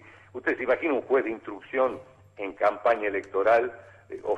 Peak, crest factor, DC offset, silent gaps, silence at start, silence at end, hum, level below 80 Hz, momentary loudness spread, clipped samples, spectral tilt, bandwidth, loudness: -12 dBFS; 16 dB; under 0.1%; none; 0.05 s; 0 s; none; -66 dBFS; 15 LU; under 0.1%; -6 dB/octave; 8.4 kHz; -26 LUFS